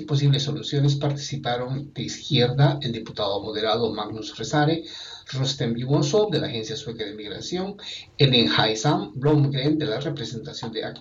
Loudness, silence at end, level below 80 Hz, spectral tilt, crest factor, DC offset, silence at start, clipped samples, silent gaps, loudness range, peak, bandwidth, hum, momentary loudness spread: -24 LUFS; 0 s; -56 dBFS; -5.5 dB/octave; 20 dB; under 0.1%; 0 s; under 0.1%; none; 4 LU; -4 dBFS; 7.6 kHz; none; 12 LU